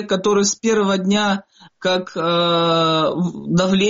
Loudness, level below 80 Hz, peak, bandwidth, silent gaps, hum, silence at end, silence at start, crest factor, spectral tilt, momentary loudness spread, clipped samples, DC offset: -18 LUFS; -54 dBFS; -6 dBFS; 7.6 kHz; none; none; 0 s; 0 s; 12 dB; -4 dB/octave; 5 LU; under 0.1%; under 0.1%